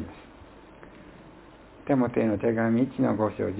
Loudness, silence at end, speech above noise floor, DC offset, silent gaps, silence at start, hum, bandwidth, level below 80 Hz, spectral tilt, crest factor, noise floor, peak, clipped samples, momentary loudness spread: -25 LUFS; 0 s; 25 dB; under 0.1%; none; 0 s; none; 4 kHz; -54 dBFS; -12 dB/octave; 18 dB; -50 dBFS; -10 dBFS; under 0.1%; 24 LU